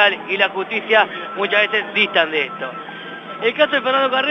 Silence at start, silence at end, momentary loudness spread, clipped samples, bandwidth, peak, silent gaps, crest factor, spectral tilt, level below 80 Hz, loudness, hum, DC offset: 0 s; 0 s; 13 LU; under 0.1%; 6.8 kHz; 0 dBFS; none; 18 dB; -4.5 dB/octave; -74 dBFS; -17 LUFS; none; under 0.1%